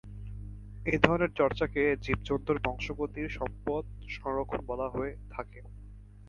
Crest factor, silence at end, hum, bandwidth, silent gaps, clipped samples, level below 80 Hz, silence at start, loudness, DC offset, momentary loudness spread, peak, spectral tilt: 30 dB; 0 s; 50 Hz at -50 dBFS; 7.2 kHz; none; under 0.1%; -46 dBFS; 0.05 s; -31 LUFS; under 0.1%; 19 LU; -2 dBFS; -7 dB/octave